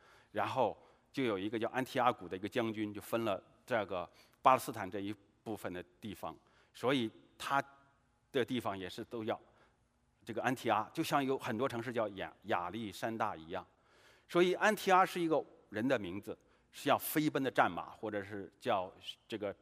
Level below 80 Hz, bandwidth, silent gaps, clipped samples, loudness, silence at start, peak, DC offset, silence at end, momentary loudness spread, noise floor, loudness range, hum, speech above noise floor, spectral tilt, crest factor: -78 dBFS; 15.5 kHz; none; under 0.1%; -36 LUFS; 0.35 s; -12 dBFS; under 0.1%; 0.1 s; 14 LU; -75 dBFS; 6 LU; none; 39 dB; -5 dB/octave; 24 dB